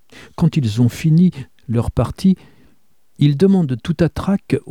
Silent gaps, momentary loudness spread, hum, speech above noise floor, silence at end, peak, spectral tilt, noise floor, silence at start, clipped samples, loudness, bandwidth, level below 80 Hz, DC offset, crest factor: none; 8 LU; none; 45 dB; 0 s; -2 dBFS; -8 dB/octave; -61 dBFS; 0.4 s; under 0.1%; -17 LUFS; 13.5 kHz; -38 dBFS; 0.4%; 14 dB